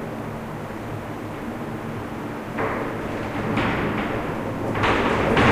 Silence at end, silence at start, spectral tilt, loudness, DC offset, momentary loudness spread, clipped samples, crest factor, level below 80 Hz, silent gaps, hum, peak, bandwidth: 0 s; 0 s; -6.5 dB/octave; -25 LUFS; under 0.1%; 11 LU; under 0.1%; 20 dB; -40 dBFS; none; none; -4 dBFS; 15.5 kHz